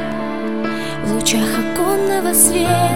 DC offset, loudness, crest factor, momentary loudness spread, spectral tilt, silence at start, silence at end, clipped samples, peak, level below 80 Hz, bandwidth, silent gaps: 3%; -16 LUFS; 16 dB; 11 LU; -3.5 dB/octave; 0 s; 0 s; under 0.1%; 0 dBFS; -42 dBFS; 17 kHz; none